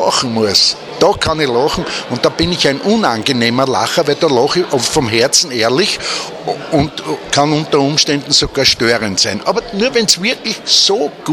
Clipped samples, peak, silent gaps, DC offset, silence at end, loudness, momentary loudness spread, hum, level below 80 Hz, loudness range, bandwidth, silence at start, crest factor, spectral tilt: under 0.1%; 0 dBFS; none; under 0.1%; 0 s; -13 LUFS; 7 LU; none; -40 dBFS; 2 LU; 19.5 kHz; 0 s; 14 dB; -3 dB/octave